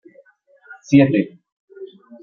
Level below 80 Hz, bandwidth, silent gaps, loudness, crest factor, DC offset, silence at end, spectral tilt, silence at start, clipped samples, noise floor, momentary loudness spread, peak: -58 dBFS; 7 kHz; 1.52-1.68 s; -16 LUFS; 20 dB; under 0.1%; 0.35 s; -8 dB/octave; 0.7 s; under 0.1%; -53 dBFS; 25 LU; -2 dBFS